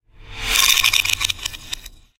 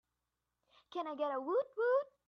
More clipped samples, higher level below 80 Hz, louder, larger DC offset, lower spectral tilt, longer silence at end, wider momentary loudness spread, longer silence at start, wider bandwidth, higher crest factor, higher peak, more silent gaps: neither; first, -38 dBFS vs -90 dBFS; first, -16 LUFS vs -37 LUFS; neither; second, 1.5 dB/octave vs -4.5 dB/octave; about the same, 0.25 s vs 0.2 s; first, 18 LU vs 10 LU; second, 0.2 s vs 0.9 s; first, over 20 kHz vs 6.2 kHz; first, 22 dB vs 16 dB; first, 0 dBFS vs -24 dBFS; neither